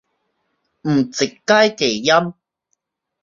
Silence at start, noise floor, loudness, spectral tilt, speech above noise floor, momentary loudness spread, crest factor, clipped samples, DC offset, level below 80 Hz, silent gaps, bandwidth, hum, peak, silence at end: 0.85 s; -73 dBFS; -17 LUFS; -4 dB/octave; 56 dB; 9 LU; 18 dB; under 0.1%; under 0.1%; -62 dBFS; none; 7.4 kHz; none; -2 dBFS; 0.9 s